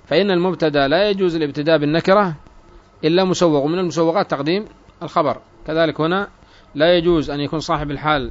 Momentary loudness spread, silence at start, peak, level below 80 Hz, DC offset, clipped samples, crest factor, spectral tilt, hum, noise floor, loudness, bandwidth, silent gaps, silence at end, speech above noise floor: 8 LU; 0.1 s; -2 dBFS; -44 dBFS; under 0.1%; under 0.1%; 16 dB; -6 dB/octave; none; -45 dBFS; -18 LUFS; 7.8 kHz; none; 0 s; 28 dB